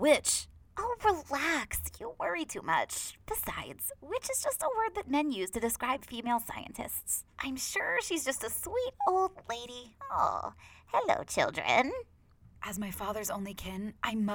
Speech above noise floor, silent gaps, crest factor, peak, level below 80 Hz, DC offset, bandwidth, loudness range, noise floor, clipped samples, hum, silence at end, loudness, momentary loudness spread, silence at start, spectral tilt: 25 dB; none; 22 dB; -12 dBFS; -56 dBFS; under 0.1%; over 20 kHz; 2 LU; -58 dBFS; under 0.1%; none; 0 s; -33 LUFS; 10 LU; 0 s; -2.5 dB/octave